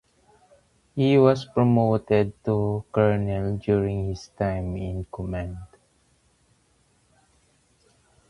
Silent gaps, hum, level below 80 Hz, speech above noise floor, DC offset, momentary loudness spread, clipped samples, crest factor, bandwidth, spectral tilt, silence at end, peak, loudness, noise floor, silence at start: none; none; -46 dBFS; 41 dB; under 0.1%; 13 LU; under 0.1%; 22 dB; 11 kHz; -8.5 dB/octave; 2.65 s; -4 dBFS; -24 LUFS; -64 dBFS; 0.95 s